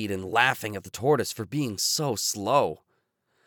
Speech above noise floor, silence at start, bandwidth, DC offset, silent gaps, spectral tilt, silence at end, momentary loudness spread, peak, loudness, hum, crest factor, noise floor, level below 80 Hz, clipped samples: 47 dB; 0 s; over 20 kHz; under 0.1%; none; -3.5 dB/octave; 0.7 s; 9 LU; -4 dBFS; -26 LUFS; none; 22 dB; -73 dBFS; -66 dBFS; under 0.1%